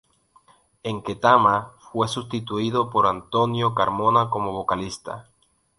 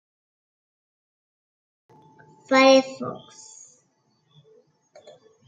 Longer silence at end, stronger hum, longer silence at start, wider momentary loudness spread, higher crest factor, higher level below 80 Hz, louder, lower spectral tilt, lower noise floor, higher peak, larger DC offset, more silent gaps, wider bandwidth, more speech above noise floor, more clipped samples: second, 0.6 s vs 2.3 s; neither; second, 0.85 s vs 2.5 s; second, 15 LU vs 29 LU; about the same, 22 dB vs 24 dB; first, -54 dBFS vs -76 dBFS; second, -22 LUFS vs -19 LUFS; first, -5.5 dB/octave vs -3.5 dB/octave; second, -58 dBFS vs -68 dBFS; about the same, -2 dBFS vs -4 dBFS; neither; neither; first, 11.5 kHz vs 7.8 kHz; second, 36 dB vs 48 dB; neither